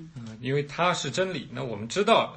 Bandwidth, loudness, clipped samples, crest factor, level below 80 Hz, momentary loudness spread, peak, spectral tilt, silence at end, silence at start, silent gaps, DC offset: 8.8 kHz; -27 LUFS; under 0.1%; 20 dB; -62 dBFS; 13 LU; -8 dBFS; -4.5 dB/octave; 0 s; 0 s; none; under 0.1%